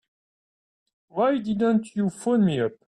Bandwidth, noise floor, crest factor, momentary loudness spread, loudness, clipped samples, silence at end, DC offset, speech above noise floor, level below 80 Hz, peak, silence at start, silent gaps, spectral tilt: 11 kHz; under -90 dBFS; 14 dB; 5 LU; -24 LUFS; under 0.1%; 0.15 s; under 0.1%; over 67 dB; -64 dBFS; -12 dBFS; 1.15 s; none; -7 dB/octave